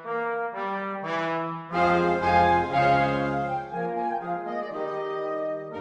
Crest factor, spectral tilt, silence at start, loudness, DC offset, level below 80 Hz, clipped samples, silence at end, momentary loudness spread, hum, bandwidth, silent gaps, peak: 16 dB; -7 dB/octave; 0 s; -26 LUFS; under 0.1%; -52 dBFS; under 0.1%; 0 s; 10 LU; none; 9.6 kHz; none; -8 dBFS